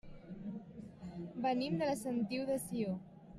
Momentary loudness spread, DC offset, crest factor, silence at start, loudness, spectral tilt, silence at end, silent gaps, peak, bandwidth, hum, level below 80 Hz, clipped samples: 14 LU; under 0.1%; 16 dB; 0.05 s; -39 LUFS; -6 dB/octave; 0 s; none; -24 dBFS; 15.5 kHz; none; -66 dBFS; under 0.1%